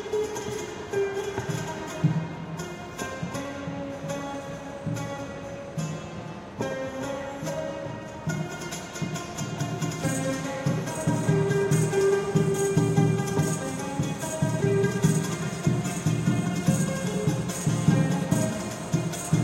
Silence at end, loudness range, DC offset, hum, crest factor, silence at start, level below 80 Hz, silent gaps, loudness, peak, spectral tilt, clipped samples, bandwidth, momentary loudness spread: 0 s; 9 LU; under 0.1%; none; 20 dB; 0 s; -54 dBFS; none; -28 LUFS; -8 dBFS; -6 dB/octave; under 0.1%; 16 kHz; 11 LU